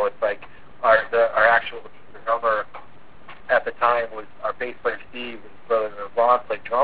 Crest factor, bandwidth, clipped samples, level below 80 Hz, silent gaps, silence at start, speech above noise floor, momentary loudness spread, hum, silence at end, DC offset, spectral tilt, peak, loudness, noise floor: 22 dB; 4 kHz; under 0.1%; -58 dBFS; none; 0 s; 25 dB; 16 LU; none; 0 s; 1%; -7 dB/octave; -2 dBFS; -22 LUFS; -48 dBFS